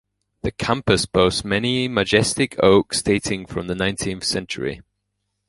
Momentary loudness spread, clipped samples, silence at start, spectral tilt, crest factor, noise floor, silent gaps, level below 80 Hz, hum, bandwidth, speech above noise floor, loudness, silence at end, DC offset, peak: 11 LU; under 0.1%; 0.45 s; -4 dB/octave; 20 dB; -75 dBFS; none; -42 dBFS; none; 11.5 kHz; 55 dB; -20 LUFS; 0.7 s; under 0.1%; 0 dBFS